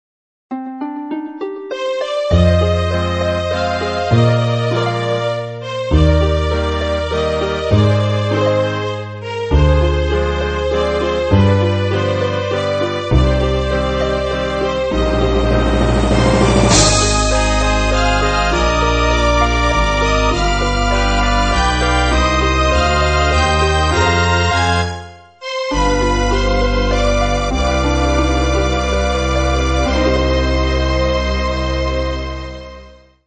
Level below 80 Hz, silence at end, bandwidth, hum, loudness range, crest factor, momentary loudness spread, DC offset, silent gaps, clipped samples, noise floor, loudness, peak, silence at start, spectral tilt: -20 dBFS; 0.35 s; 8.8 kHz; none; 4 LU; 14 dB; 8 LU; 0.1%; none; under 0.1%; -40 dBFS; -15 LUFS; 0 dBFS; 0.5 s; -5 dB/octave